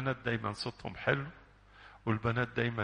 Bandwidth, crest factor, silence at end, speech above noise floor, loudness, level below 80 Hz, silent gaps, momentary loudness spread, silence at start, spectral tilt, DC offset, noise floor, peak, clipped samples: 10 kHz; 22 dB; 0 s; 23 dB; -35 LUFS; -60 dBFS; none; 8 LU; 0 s; -6.5 dB/octave; under 0.1%; -57 dBFS; -14 dBFS; under 0.1%